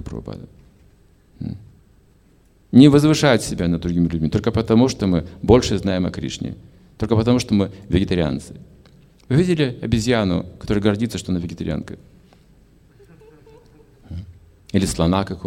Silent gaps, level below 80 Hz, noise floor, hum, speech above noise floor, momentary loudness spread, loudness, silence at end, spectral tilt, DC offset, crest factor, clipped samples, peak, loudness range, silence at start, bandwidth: none; -38 dBFS; -54 dBFS; none; 36 dB; 19 LU; -19 LUFS; 0 s; -6.5 dB/octave; under 0.1%; 20 dB; under 0.1%; 0 dBFS; 11 LU; 0 s; 15.5 kHz